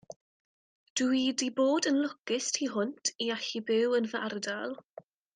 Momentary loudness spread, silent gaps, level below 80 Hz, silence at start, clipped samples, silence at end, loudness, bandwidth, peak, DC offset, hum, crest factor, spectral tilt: 8 LU; 0.16-0.96 s, 2.20-2.24 s; -80 dBFS; 0.1 s; under 0.1%; 0.6 s; -30 LUFS; 10.5 kHz; -16 dBFS; under 0.1%; none; 16 dB; -2.5 dB/octave